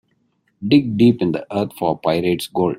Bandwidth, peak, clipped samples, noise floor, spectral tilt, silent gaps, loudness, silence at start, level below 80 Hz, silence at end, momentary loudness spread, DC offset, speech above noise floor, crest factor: 16 kHz; -2 dBFS; under 0.1%; -65 dBFS; -7 dB/octave; none; -18 LUFS; 0.6 s; -54 dBFS; 0 s; 7 LU; under 0.1%; 48 dB; 16 dB